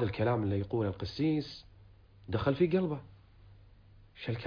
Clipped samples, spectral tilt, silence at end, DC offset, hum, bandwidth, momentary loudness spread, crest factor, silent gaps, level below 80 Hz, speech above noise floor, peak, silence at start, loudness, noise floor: under 0.1%; -8.5 dB/octave; 0 s; under 0.1%; none; 5.2 kHz; 14 LU; 18 dB; none; -56 dBFS; 26 dB; -14 dBFS; 0 s; -33 LUFS; -58 dBFS